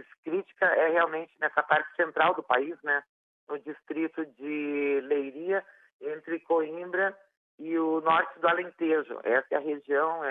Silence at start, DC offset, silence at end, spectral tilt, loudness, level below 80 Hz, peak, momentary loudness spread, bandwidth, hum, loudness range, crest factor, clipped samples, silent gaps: 0.25 s; under 0.1%; 0 s; -7.5 dB/octave; -28 LUFS; -88 dBFS; -10 dBFS; 12 LU; 4.1 kHz; none; 5 LU; 20 dB; under 0.1%; 3.09-3.47 s, 5.92-5.99 s, 7.37-7.58 s